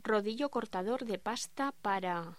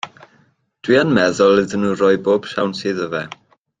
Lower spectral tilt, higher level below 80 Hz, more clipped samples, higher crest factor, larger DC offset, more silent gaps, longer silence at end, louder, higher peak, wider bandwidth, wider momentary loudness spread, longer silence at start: second, -4 dB/octave vs -5.5 dB/octave; second, -72 dBFS vs -56 dBFS; neither; about the same, 16 dB vs 16 dB; first, 0.2% vs under 0.1%; neither; second, 0.05 s vs 0.5 s; second, -35 LUFS vs -17 LUFS; second, -20 dBFS vs -2 dBFS; first, 16 kHz vs 9.4 kHz; second, 4 LU vs 13 LU; about the same, 0.05 s vs 0.05 s